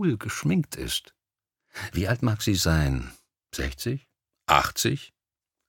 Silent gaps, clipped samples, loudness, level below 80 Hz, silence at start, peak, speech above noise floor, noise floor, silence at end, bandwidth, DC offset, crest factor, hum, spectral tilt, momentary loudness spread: none; under 0.1%; -26 LUFS; -40 dBFS; 0 s; -2 dBFS; 63 dB; -88 dBFS; 0.6 s; 19 kHz; under 0.1%; 26 dB; none; -4.5 dB/octave; 15 LU